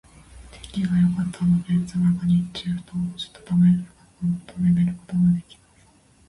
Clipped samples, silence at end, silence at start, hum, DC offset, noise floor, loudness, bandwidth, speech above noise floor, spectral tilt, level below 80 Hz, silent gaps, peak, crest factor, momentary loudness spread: under 0.1%; 0.85 s; 0.35 s; none; under 0.1%; -56 dBFS; -23 LUFS; 11.5 kHz; 34 dB; -8 dB/octave; -48 dBFS; none; -10 dBFS; 12 dB; 10 LU